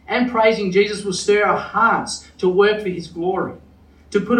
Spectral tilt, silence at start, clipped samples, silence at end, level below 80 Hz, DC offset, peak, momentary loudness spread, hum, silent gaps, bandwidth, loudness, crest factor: -4.5 dB/octave; 0.1 s; under 0.1%; 0 s; -52 dBFS; under 0.1%; -2 dBFS; 9 LU; none; none; 10.5 kHz; -19 LUFS; 16 dB